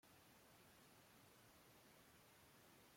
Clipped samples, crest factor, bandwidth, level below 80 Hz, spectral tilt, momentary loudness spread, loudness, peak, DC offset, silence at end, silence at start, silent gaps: under 0.1%; 14 dB; 16.5 kHz; -88 dBFS; -3 dB/octave; 0 LU; -68 LUFS; -56 dBFS; under 0.1%; 0 s; 0.05 s; none